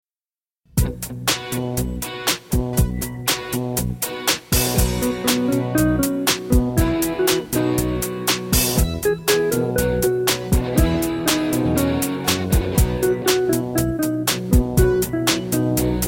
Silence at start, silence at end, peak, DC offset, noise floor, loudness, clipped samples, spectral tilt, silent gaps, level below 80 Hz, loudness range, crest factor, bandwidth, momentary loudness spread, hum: 0.75 s; 0 s; -4 dBFS; under 0.1%; under -90 dBFS; -20 LUFS; under 0.1%; -4.5 dB/octave; none; -28 dBFS; 3 LU; 16 dB; 17 kHz; 5 LU; none